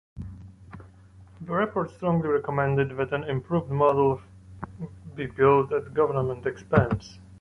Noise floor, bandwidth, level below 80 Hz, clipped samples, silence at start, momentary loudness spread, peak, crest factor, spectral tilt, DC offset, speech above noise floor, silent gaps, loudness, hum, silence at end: -50 dBFS; 6.6 kHz; -50 dBFS; under 0.1%; 0.15 s; 21 LU; -6 dBFS; 20 dB; -8.5 dB/octave; under 0.1%; 26 dB; none; -25 LUFS; none; 0.05 s